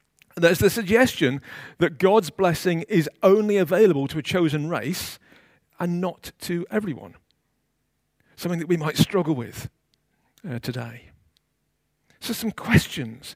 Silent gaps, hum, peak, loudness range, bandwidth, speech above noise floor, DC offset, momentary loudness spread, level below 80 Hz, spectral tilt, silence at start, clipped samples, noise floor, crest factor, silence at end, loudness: none; none; -2 dBFS; 11 LU; 16 kHz; 51 dB; under 0.1%; 17 LU; -52 dBFS; -5.5 dB/octave; 0.35 s; under 0.1%; -73 dBFS; 20 dB; 0 s; -23 LUFS